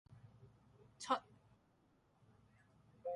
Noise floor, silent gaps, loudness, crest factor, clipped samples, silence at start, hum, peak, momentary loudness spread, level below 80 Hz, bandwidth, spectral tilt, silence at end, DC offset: -75 dBFS; none; -43 LUFS; 28 dB; under 0.1%; 0.1 s; none; -22 dBFS; 24 LU; -80 dBFS; 11 kHz; -3.5 dB/octave; 0 s; under 0.1%